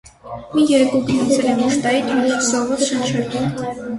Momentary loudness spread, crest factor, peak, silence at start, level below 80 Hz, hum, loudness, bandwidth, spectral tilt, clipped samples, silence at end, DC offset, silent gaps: 8 LU; 14 dB; -4 dBFS; 0.25 s; -52 dBFS; none; -17 LUFS; 11.5 kHz; -4.5 dB/octave; under 0.1%; 0 s; under 0.1%; none